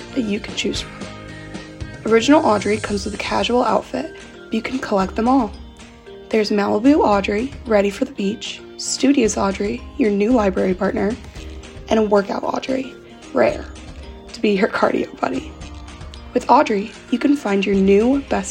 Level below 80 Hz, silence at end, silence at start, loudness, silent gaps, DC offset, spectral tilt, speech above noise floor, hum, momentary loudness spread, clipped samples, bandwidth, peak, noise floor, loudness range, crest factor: -40 dBFS; 0 s; 0 s; -19 LUFS; none; under 0.1%; -5 dB/octave; 21 dB; none; 20 LU; under 0.1%; 11.5 kHz; 0 dBFS; -39 dBFS; 3 LU; 18 dB